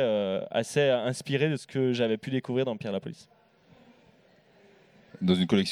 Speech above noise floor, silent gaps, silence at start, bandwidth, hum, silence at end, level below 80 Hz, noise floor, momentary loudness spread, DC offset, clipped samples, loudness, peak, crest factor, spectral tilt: 33 dB; none; 0 s; 14 kHz; none; 0 s; -70 dBFS; -61 dBFS; 9 LU; under 0.1%; under 0.1%; -28 LUFS; -10 dBFS; 20 dB; -6 dB/octave